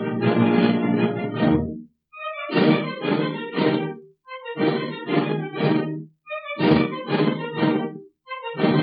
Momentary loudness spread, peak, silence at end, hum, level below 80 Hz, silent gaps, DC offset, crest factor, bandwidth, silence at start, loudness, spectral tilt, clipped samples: 15 LU; -6 dBFS; 0 s; none; -52 dBFS; none; under 0.1%; 18 dB; 5.2 kHz; 0 s; -22 LUFS; -11 dB/octave; under 0.1%